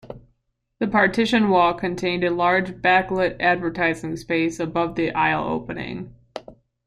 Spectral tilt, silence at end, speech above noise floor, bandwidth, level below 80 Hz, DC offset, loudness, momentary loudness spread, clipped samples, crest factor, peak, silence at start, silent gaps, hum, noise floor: -5.5 dB/octave; 0.35 s; 50 dB; 12.5 kHz; -50 dBFS; under 0.1%; -21 LUFS; 15 LU; under 0.1%; 18 dB; -4 dBFS; 0.05 s; none; none; -71 dBFS